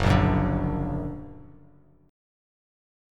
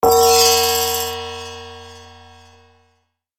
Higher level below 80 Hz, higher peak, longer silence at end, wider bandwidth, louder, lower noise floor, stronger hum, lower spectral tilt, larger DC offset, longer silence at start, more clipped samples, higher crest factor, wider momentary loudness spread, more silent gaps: first, -36 dBFS vs -48 dBFS; second, -6 dBFS vs -2 dBFS; first, 1.7 s vs 1.35 s; second, 11 kHz vs 17.5 kHz; second, -26 LUFS vs -14 LUFS; second, -56 dBFS vs -66 dBFS; neither; first, -7.5 dB/octave vs -1 dB/octave; second, under 0.1% vs 0.2%; about the same, 0 s vs 0.05 s; neither; about the same, 20 dB vs 18 dB; second, 19 LU vs 24 LU; neither